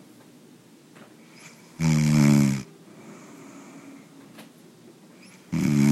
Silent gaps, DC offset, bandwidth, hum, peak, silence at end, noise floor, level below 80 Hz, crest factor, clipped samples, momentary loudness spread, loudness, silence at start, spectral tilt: none; under 0.1%; 15 kHz; none; -8 dBFS; 0 s; -52 dBFS; -54 dBFS; 18 dB; under 0.1%; 28 LU; -22 LUFS; 1.45 s; -6.5 dB/octave